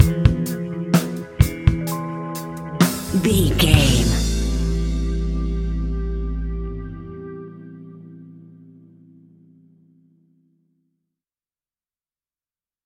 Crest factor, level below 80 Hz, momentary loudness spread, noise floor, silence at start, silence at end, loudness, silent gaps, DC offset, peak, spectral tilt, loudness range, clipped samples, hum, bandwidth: 22 dB; -28 dBFS; 20 LU; under -90 dBFS; 0 s; 4.4 s; -21 LUFS; none; under 0.1%; 0 dBFS; -5.5 dB/octave; 18 LU; under 0.1%; none; 17 kHz